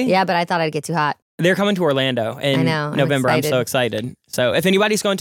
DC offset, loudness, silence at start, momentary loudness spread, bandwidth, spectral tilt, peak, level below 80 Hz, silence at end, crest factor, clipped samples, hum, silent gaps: under 0.1%; -19 LUFS; 0 s; 5 LU; 17 kHz; -5 dB/octave; 0 dBFS; -60 dBFS; 0 s; 18 dB; under 0.1%; none; 1.22-1.38 s